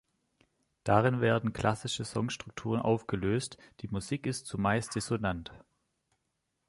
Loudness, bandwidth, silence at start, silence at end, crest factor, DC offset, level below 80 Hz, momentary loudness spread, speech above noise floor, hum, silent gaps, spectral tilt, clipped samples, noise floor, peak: -32 LUFS; 11.5 kHz; 0.85 s; 1.1 s; 24 dB; under 0.1%; -56 dBFS; 12 LU; 50 dB; none; none; -5.5 dB/octave; under 0.1%; -81 dBFS; -10 dBFS